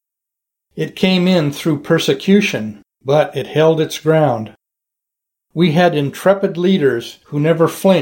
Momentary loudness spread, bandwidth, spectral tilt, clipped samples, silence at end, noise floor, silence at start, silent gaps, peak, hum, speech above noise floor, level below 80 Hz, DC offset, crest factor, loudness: 12 LU; 17 kHz; -6 dB/octave; under 0.1%; 0 s; -82 dBFS; 0.75 s; none; 0 dBFS; none; 68 dB; -58 dBFS; under 0.1%; 16 dB; -15 LUFS